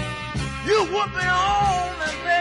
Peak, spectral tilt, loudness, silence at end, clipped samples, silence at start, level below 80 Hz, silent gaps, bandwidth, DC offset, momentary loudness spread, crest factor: -8 dBFS; -4 dB/octave; -22 LUFS; 0 s; under 0.1%; 0 s; -40 dBFS; none; 11 kHz; under 0.1%; 8 LU; 14 dB